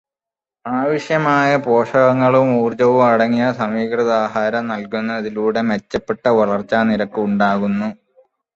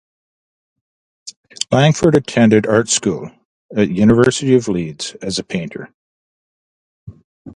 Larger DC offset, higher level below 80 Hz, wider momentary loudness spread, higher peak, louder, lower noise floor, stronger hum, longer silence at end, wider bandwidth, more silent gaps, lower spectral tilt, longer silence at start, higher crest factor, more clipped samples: neither; second, -56 dBFS vs -46 dBFS; second, 9 LU vs 22 LU; about the same, -2 dBFS vs 0 dBFS; about the same, -17 LUFS vs -15 LUFS; about the same, -89 dBFS vs under -90 dBFS; neither; first, 0.6 s vs 0.05 s; second, 7.8 kHz vs 11.5 kHz; second, none vs 1.36-1.43 s, 3.45-3.69 s, 5.94-7.07 s, 7.24-7.45 s; first, -7 dB/octave vs -5 dB/octave; second, 0.65 s vs 1.25 s; about the same, 14 dB vs 18 dB; neither